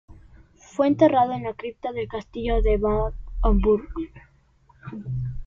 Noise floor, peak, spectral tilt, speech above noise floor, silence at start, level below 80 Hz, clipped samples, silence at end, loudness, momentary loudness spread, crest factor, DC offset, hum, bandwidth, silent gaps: -58 dBFS; -4 dBFS; -8.5 dB/octave; 36 dB; 0.1 s; -30 dBFS; under 0.1%; 0 s; -24 LUFS; 17 LU; 20 dB; under 0.1%; none; 7.4 kHz; none